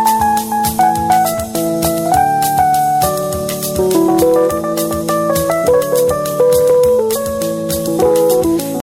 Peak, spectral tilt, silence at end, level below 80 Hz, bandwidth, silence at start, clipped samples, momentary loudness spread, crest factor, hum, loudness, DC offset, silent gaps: 0 dBFS; -4.5 dB/octave; 0.15 s; -38 dBFS; 17 kHz; 0 s; under 0.1%; 6 LU; 12 dB; none; -13 LUFS; under 0.1%; none